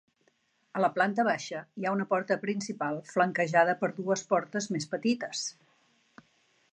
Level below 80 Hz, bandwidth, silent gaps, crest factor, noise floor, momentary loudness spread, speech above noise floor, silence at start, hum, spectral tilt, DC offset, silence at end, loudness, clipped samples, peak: -82 dBFS; 9.4 kHz; none; 20 dB; -71 dBFS; 9 LU; 42 dB; 0.75 s; none; -4.5 dB/octave; under 0.1%; 1.2 s; -30 LUFS; under 0.1%; -10 dBFS